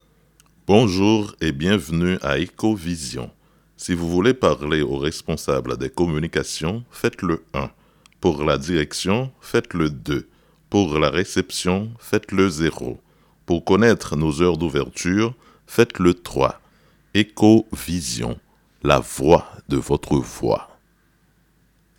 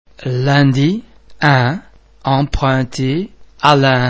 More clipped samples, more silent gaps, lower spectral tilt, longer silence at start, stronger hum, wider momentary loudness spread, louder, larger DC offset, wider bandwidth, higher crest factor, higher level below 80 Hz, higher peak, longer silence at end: second, under 0.1% vs 0.1%; neither; about the same, -5.5 dB/octave vs -6.5 dB/octave; first, 0.7 s vs 0.2 s; neither; about the same, 10 LU vs 12 LU; second, -21 LUFS vs -15 LUFS; neither; first, 18 kHz vs 8 kHz; first, 22 dB vs 14 dB; second, -42 dBFS vs -34 dBFS; about the same, 0 dBFS vs 0 dBFS; first, 1.35 s vs 0 s